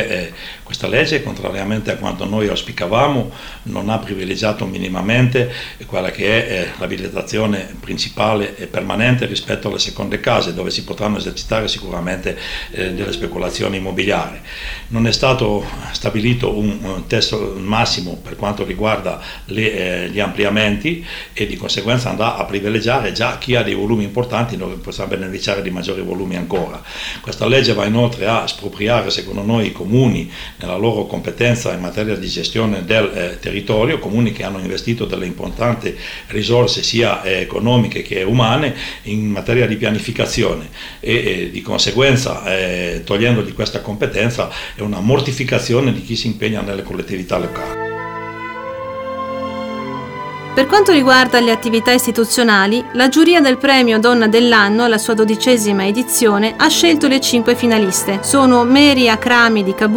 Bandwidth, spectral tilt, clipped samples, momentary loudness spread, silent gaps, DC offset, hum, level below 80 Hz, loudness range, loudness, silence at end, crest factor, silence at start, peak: over 20 kHz; -4.5 dB/octave; under 0.1%; 13 LU; none; under 0.1%; none; -36 dBFS; 8 LU; -16 LUFS; 0 s; 16 dB; 0 s; 0 dBFS